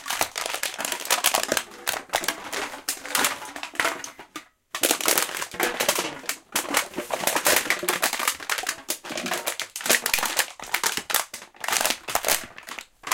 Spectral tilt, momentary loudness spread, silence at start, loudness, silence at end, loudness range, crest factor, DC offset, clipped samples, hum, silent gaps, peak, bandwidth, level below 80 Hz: 0 dB/octave; 12 LU; 0 s; -24 LUFS; 0 s; 2 LU; 26 dB; under 0.1%; under 0.1%; none; none; 0 dBFS; 17 kHz; -60 dBFS